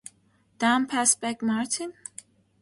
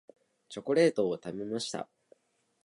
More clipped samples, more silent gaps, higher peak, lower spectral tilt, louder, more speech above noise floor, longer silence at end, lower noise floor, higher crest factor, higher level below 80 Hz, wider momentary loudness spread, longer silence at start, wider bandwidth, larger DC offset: neither; neither; first, -4 dBFS vs -12 dBFS; second, -2 dB/octave vs -5 dB/octave; first, -25 LUFS vs -31 LUFS; about the same, 39 dB vs 36 dB; about the same, 0.7 s vs 0.8 s; about the same, -64 dBFS vs -66 dBFS; about the same, 24 dB vs 20 dB; about the same, -72 dBFS vs -76 dBFS; first, 20 LU vs 17 LU; about the same, 0.6 s vs 0.5 s; about the same, 11.5 kHz vs 11.5 kHz; neither